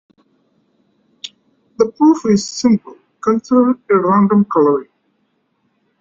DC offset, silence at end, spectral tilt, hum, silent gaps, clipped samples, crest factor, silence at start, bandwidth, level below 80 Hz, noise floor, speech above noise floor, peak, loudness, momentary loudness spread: under 0.1%; 1.15 s; -6.5 dB/octave; none; none; under 0.1%; 16 dB; 1.25 s; 7.6 kHz; -58 dBFS; -64 dBFS; 51 dB; -2 dBFS; -14 LUFS; 15 LU